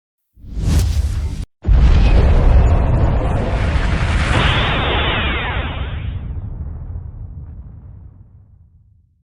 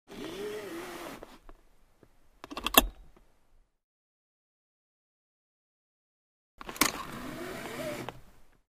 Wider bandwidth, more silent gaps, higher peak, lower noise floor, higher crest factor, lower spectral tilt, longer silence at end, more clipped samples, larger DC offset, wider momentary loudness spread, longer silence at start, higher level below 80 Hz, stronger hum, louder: second, 11 kHz vs 15.5 kHz; second, none vs 3.83-6.58 s; about the same, -2 dBFS vs 0 dBFS; second, -51 dBFS vs -64 dBFS; second, 14 dB vs 36 dB; first, -6 dB/octave vs -2 dB/octave; first, 1.2 s vs 0.25 s; neither; neither; about the same, 19 LU vs 21 LU; first, 0.45 s vs 0.1 s; first, -18 dBFS vs -52 dBFS; neither; first, -17 LUFS vs -31 LUFS